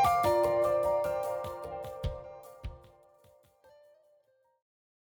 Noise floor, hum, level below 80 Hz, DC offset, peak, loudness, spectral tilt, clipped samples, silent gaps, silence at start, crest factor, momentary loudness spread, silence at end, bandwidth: -69 dBFS; none; -52 dBFS; under 0.1%; -16 dBFS; -31 LUFS; -5.5 dB/octave; under 0.1%; none; 0 s; 18 dB; 20 LU; 2.4 s; over 20 kHz